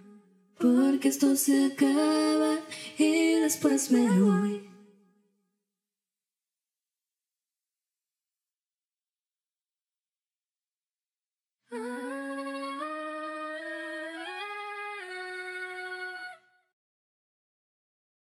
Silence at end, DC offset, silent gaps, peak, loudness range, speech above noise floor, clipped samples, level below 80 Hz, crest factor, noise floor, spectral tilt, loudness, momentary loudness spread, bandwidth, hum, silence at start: 1.85 s; under 0.1%; 8.87-8.91 s; -12 dBFS; 16 LU; over 65 dB; under 0.1%; under -90 dBFS; 18 dB; under -90 dBFS; -4.5 dB/octave; -28 LUFS; 14 LU; 16 kHz; none; 0.1 s